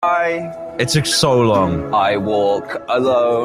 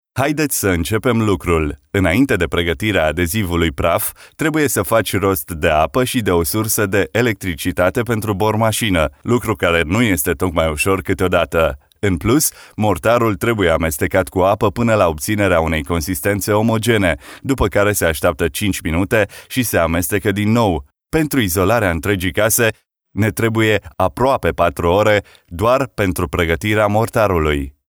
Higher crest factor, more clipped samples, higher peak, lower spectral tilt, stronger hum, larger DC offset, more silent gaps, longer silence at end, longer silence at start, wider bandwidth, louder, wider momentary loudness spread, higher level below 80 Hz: about the same, 14 dB vs 16 dB; neither; about the same, -2 dBFS vs -2 dBFS; about the same, -4.5 dB/octave vs -5 dB/octave; neither; neither; neither; second, 0 s vs 0.2 s; second, 0 s vs 0.15 s; second, 15 kHz vs over 20 kHz; about the same, -16 LUFS vs -17 LUFS; first, 8 LU vs 4 LU; second, -46 dBFS vs -34 dBFS